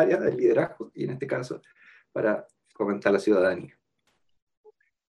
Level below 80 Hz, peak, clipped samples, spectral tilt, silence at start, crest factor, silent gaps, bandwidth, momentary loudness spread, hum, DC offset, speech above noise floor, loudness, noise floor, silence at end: -72 dBFS; -6 dBFS; under 0.1%; -7 dB/octave; 0 s; 20 dB; none; 11.5 kHz; 14 LU; none; under 0.1%; 48 dB; -26 LUFS; -73 dBFS; 1.45 s